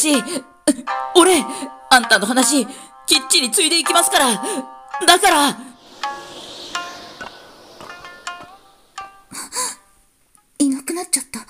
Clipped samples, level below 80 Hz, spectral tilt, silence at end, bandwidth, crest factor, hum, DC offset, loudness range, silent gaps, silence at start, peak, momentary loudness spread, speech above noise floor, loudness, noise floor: under 0.1%; -58 dBFS; -1 dB/octave; 0.05 s; 16 kHz; 18 dB; none; under 0.1%; 17 LU; none; 0 s; 0 dBFS; 22 LU; 41 dB; -16 LUFS; -57 dBFS